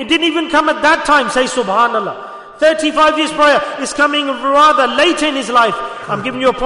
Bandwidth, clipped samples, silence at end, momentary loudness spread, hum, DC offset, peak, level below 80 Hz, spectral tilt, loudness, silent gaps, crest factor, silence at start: 11 kHz; under 0.1%; 0 s; 10 LU; none; under 0.1%; -2 dBFS; -46 dBFS; -2.5 dB/octave; -13 LUFS; none; 12 dB; 0 s